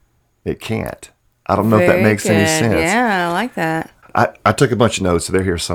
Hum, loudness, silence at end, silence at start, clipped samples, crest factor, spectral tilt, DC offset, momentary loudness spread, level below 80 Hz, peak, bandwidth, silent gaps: none; -16 LUFS; 0 s; 0.45 s; under 0.1%; 16 dB; -5 dB/octave; under 0.1%; 13 LU; -42 dBFS; 0 dBFS; 18.5 kHz; none